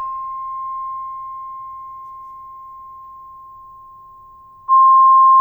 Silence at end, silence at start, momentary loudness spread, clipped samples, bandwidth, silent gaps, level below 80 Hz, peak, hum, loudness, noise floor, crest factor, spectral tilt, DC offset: 0 s; 0 s; 28 LU; under 0.1%; 2.2 kHz; none; -60 dBFS; -6 dBFS; none; -14 LUFS; -43 dBFS; 12 dB; -5.5 dB/octave; under 0.1%